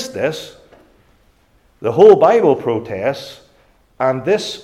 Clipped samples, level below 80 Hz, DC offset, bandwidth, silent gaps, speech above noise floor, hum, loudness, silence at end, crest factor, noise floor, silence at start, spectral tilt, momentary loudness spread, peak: under 0.1%; -56 dBFS; under 0.1%; 13 kHz; none; 41 dB; none; -14 LUFS; 0 s; 16 dB; -55 dBFS; 0 s; -5.5 dB/octave; 20 LU; 0 dBFS